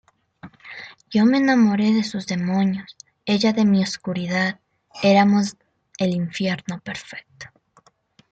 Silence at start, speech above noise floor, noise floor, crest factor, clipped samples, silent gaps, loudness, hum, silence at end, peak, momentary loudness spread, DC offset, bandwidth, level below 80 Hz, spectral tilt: 0.45 s; 38 dB; -58 dBFS; 18 dB; under 0.1%; none; -20 LUFS; none; 0.85 s; -4 dBFS; 21 LU; under 0.1%; 8.2 kHz; -62 dBFS; -6 dB/octave